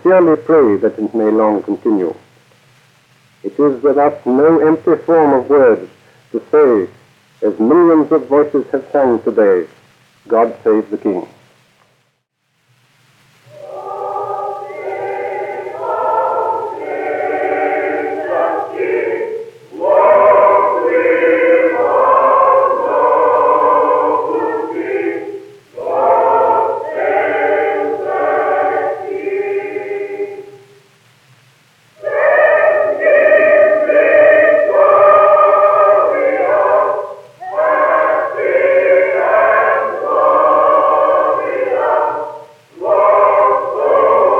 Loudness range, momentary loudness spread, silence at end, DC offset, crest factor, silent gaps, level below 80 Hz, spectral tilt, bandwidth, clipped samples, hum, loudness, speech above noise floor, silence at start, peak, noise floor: 10 LU; 13 LU; 0 s; under 0.1%; 12 dB; none; -70 dBFS; -7.5 dB/octave; 6 kHz; under 0.1%; none; -13 LUFS; 53 dB; 0.05 s; 0 dBFS; -65 dBFS